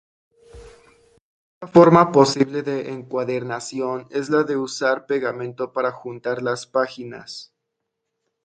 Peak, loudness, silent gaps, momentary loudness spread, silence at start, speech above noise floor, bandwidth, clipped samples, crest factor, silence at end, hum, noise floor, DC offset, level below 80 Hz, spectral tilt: 0 dBFS; -20 LUFS; 1.21-1.61 s; 16 LU; 0.55 s; 59 dB; 9.2 kHz; under 0.1%; 22 dB; 1 s; none; -79 dBFS; under 0.1%; -58 dBFS; -6 dB/octave